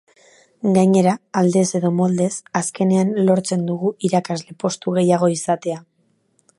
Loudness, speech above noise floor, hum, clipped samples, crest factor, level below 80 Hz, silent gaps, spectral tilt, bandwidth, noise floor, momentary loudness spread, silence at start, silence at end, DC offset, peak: -19 LUFS; 46 dB; none; under 0.1%; 18 dB; -66 dBFS; none; -6 dB/octave; 11.5 kHz; -64 dBFS; 8 LU; 0.65 s; 0.8 s; under 0.1%; -2 dBFS